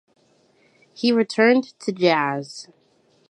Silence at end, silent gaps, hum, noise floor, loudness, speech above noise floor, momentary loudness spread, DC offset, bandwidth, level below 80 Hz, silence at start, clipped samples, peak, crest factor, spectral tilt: 0.65 s; none; none; -60 dBFS; -20 LUFS; 40 dB; 14 LU; under 0.1%; 10.5 kHz; -78 dBFS; 1 s; under 0.1%; -4 dBFS; 18 dB; -5 dB/octave